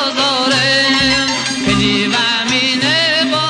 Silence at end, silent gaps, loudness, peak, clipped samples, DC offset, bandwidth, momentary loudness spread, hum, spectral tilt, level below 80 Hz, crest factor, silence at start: 0 s; none; -12 LUFS; -2 dBFS; under 0.1%; under 0.1%; 10 kHz; 3 LU; none; -3 dB/octave; -42 dBFS; 12 dB; 0 s